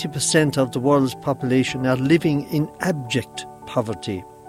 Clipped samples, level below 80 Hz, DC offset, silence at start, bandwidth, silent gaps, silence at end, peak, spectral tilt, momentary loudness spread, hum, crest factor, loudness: under 0.1%; -54 dBFS; under 0.1%; 0 s; 16 kHz; none; 0 s; -4 dBFS; -5 dB/octave; 9 LU; none; 18 dB; -21 LUFS